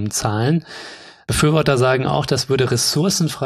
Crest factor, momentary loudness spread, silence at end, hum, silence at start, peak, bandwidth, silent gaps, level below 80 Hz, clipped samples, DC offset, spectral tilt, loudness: 18 dB; 18 LU; 0 s; none; 0 s; 0 dBFS; 14 kHz; none; -42 dBFS; under 0.1%; under 0.1%; -4.5 dB/octave; -17 LUFS